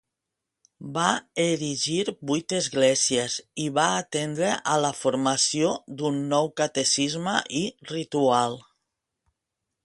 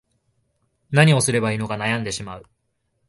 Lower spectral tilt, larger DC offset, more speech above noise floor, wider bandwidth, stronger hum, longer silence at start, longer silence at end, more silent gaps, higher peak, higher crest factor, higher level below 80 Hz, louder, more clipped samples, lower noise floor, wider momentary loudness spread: second, -3 dB/octave vs -5 dB/octave; neither; first, 60 dB vs 52 dB; about the same, 11.5 kHz vs 11.5 kHz; neither; about the same, 0.8 s vs 0.9 s; first, 1.25 s vs 0.65 s; neither; about the same, -4 dBFS vs -2 dBFS; about the same, 22 dB vs 20 dB; second, -68 dBFS vs -54 dBFS; second, -25 LUFS vs -20 LUFS; neither; first, -85 dBFS vs -72 dBFS; second, 8 LU vs 17 LU